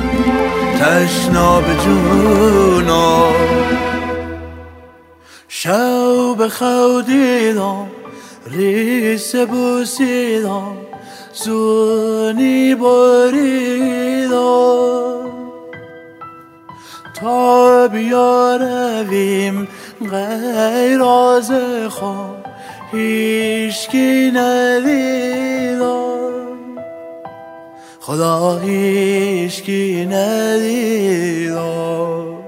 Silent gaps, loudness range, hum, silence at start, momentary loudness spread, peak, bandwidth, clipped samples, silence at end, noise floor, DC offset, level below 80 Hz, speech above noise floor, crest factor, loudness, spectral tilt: none; 5 LU; none; 0 s; 19 LU; 0 dBFS; 16 kHz; under 0.1%; 0 s; -43 dBFS; under 0.1%; -38 dBFS; 29 dB; 14 dB; -14 LUFS; -5 dB/octave